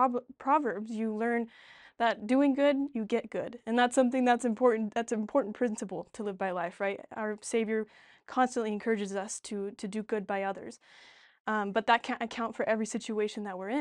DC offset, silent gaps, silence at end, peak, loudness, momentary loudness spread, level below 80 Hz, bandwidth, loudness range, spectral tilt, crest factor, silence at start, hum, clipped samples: under 0.1%; 11.40-11.45 s; 0 s; -12 dBFS; -31 LUFS; 11 LU; -74 dBFS; 11 kHz; 6 LU; -4.5 dB/octave; 18 dB; 0 s; none; under 0.1%